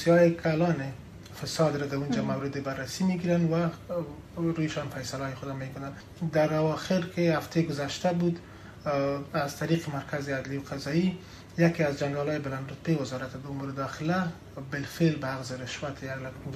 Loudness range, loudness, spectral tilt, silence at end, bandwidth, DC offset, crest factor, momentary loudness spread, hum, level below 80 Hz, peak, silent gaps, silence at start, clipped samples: 3 LU; -30 LUFS; -6.5 dB/octave; 0 s; 14.5 kHz; under 0.1%; 18 dB; 11 LU; none; -56 dBFS; -10 dBFS; none; 0 s; under 0.1%